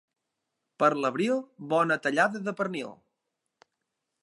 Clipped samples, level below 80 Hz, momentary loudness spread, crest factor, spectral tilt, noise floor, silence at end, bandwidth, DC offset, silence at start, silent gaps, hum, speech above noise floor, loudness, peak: under 0.1%; -84 dBFS; 8 LU; 22 dB; -5.5 dB/octave; -83 dBFS; 1.3 s; 11.5 kHz; under 0.1%; 0.8 s; none; none; 56 dB; -27 LUFS; -8 dBFS